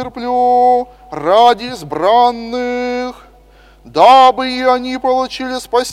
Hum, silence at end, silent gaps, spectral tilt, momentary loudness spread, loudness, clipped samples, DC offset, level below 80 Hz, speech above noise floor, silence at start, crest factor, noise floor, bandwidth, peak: none; 0 s; none; -3.5 dB/octave; 14 LU; -13 LUFS; 0.2%; under 0.1%; -46 dBFS; 31 dB; 0 s; 14 dB; -44 dBFS; 14 kHz; 0 dBFS